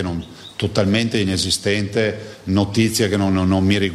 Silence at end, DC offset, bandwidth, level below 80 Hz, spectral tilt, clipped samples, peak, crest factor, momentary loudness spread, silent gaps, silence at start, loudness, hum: 0 s; under 0.1%; 14.5 kHz; -46 dBFS; -5 dB/octave; under 0.1%; -4 dBFS; 16 dB; 9 LU; none; 0 s; -19 LUFS; none